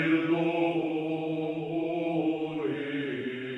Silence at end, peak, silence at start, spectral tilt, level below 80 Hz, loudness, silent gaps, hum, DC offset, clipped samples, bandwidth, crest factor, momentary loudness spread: 0 s; -16 dBFS; 0 s; -8 dB/octave; -76 dBFS; -30 LUFS; none; none; under 0.1%; under 0.1%; 4.1 kHz; 14 dB; 6 LU